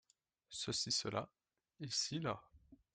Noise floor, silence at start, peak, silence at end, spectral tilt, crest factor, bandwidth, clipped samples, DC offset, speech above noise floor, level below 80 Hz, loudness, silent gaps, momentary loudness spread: -70 dBFS; 0.5 s; -24 dBFS; 0.2 s; -3 dB/octave; 20 dB; 11.5 kHz; under 0.1%; under 0.1%; 29 dB; -74 dBFS; -40 LUFS; none; 14 LU